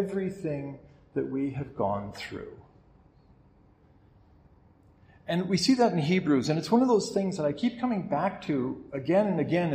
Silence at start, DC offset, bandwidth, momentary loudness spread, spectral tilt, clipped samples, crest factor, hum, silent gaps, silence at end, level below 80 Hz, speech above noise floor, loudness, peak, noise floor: 0 s; under 0.1%; 13 kHz; 14 LU; -6 dB/octave; under 0.1%; 18 dB; none; none; 0 s; -62 dBFS; 32 dB; -28 LUFS; -10 dBFS; -59 dBFS